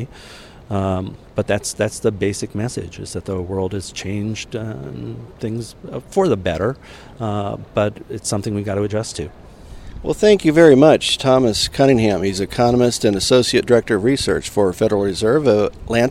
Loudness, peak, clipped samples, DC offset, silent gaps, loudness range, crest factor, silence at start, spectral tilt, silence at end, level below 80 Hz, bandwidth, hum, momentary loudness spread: -18 LUFS; 0 dBFS; under 0.1%; under 0.1%; none; 10 LU; 18 dB; 0 s; -5 dB/octave; 0 s; -42 dBFS; 15.5 kHz; none; 15 LU